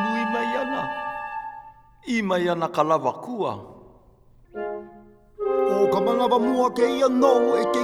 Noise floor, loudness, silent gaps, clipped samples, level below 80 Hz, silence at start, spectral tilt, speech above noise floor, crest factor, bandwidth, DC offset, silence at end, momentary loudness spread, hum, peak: -53 dBFS; -23 LUFS; none; under 0.1%; -58 dBFS; 0 s; -5.5 dB/octave; 32 dB; 18 dB; 14.5 kHz; under 0.1%; 0 s; 15 LU; none; -6 dBFS